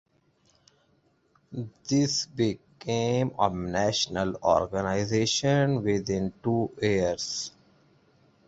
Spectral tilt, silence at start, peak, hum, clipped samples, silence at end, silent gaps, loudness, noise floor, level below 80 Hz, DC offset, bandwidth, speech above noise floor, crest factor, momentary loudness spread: -5 dB/octave; 1.5 s; -8 dBFS; none; under 0.1%; 1 s; none; -27 LUFS; -67 dBFS; -54 dBFS; under 0.1%; 8 kHz; 41 dB; 20 dB; 9 LU